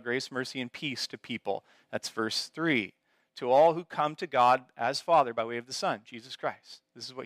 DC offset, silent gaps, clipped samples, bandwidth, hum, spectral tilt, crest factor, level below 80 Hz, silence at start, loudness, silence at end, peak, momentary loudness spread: under 0.1%; none; under 0.1%; 15.5 kHz; none; -4 dB/octave; 18 dB; -80 dBFS; 0.05 s; -29 LUFS; 0 s; -14 dBFS; 14 LU